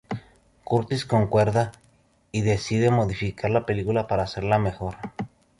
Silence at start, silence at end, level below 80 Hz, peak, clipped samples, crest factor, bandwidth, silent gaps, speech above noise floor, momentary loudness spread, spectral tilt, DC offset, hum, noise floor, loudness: 0.1 s; 0.35 s; -46 dBFS; -8 dBFS; under 0.1%; 18 dB; 11.5 kHz; none; 38 dB; 13 LU; -7 dB/octave; under 0.1%; none; -61 dBFS; -24 LUFS